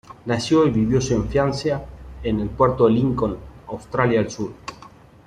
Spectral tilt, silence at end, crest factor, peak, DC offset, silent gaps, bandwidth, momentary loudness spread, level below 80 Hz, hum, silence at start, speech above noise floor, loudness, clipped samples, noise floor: -6.5 dB/octave; 0.4 s; 18 dB; -4 dBFS; under 0.1%; none; 10.5 kHz; 18 LU; -40 dBFS; none; 0.1 s; 26 dB; -21 LUFS; under 0.1%; -46 dBFS